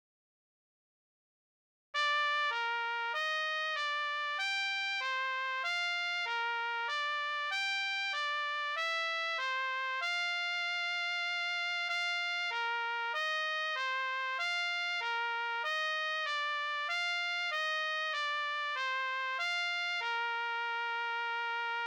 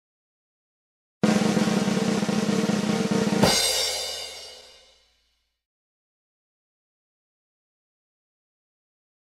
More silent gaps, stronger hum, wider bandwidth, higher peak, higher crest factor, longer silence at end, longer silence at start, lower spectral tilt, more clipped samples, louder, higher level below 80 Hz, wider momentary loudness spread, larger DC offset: neither; neither; first, 19 kHz vs 16 kHz; second, -22 dBFS vs -4 dBFS; second, 14 dB vs 22 dB; second, 0 s vs 4.6 s; first, 1.95 s vs 1.25 s; second, 4.5 dB/octave vs -4 dB/octave; neither; second, -33 LUFS vs -23 LUFS; second, under -90 dBFS vs -56 dBFS; second, 2 LU vs 12 LU; neither